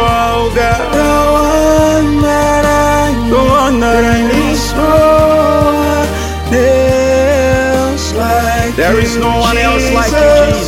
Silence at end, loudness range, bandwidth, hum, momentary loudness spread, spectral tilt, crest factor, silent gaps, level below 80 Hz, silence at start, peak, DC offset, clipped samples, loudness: 0 s; 1 LU; 16.5 kHz; none; 4 LU; -5 dB/octave; 10 dB; none; -20 dBFS; 0 s; 0 dBFS; under 0.1%; under 0.1%; -10 LUFS